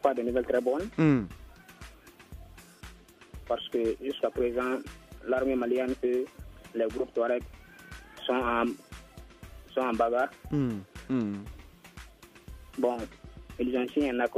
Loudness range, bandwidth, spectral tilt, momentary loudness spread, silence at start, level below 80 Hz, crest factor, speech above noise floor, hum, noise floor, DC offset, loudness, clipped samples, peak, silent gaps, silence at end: 4 LU; 15 kHz; -7 dB/octave; 23 LU; 0.05 s; -52 dBFS; 20 dB; 22 dB; none; -51 dBFS; under 0.1%; -30 LUFS; under 0.1%; -10 dBFS; none; 0 s